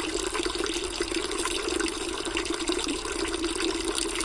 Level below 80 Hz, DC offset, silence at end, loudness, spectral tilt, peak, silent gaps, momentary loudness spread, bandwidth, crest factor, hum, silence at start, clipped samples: -44 dBFS; under 0.1%; 0 s; -28 LUFS; -2 dB/octave; -10 dBFS; none; 2 LU; 11.5 kHz; 20 dB; none; 0 s; under 0.1%